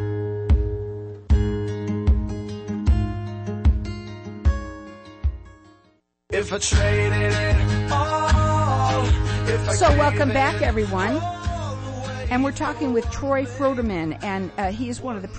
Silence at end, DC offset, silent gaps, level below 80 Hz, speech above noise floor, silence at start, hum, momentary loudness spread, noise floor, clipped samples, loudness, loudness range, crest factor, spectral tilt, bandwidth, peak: 0 s; under 0.1%; none; -28 dBFS; 40 dB; 0 s; none; 11 LU; -61 dBFS; under 0.1%; -23 LUFS; 6 LU; 14 dB; -5.5 dB/octave; 8.8 kHz; -8 dBFS